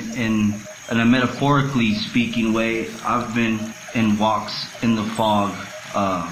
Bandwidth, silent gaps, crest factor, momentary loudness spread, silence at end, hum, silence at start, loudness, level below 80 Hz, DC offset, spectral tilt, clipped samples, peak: 15.5 kHz; none; 16 dB; 8 LU; 0 s; none; 0 s; -21 LUFS; -48 dBFS; under 0.1%; -5.5 dB/octave; under 0.1%; -4 dBFS